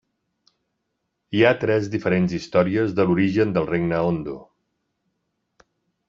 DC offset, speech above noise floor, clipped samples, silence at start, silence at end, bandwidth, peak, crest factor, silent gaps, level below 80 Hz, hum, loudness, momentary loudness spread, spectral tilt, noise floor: under 0.1%; 56 dB; under 0.1%; 1.3 s; 1.65 s; 7.4 kHz; -2 dBFS; 20 dB; none; -56 dBFS; none; -21 LUFS; 8 LU; -7.5 dB/octave; -77 dBFS